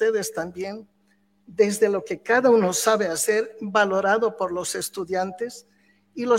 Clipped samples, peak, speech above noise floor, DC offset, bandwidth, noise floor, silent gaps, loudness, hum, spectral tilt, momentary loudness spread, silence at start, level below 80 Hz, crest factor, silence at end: under 0.1%; -6 dBFS; 42 dB; under 0.1%; 16.5 kHz; -64 dBFS; none; -23 LUFS; none; -3.5 dB/octave; 15 LU; 0 s; -66 dBFS; 18 dB; 0 s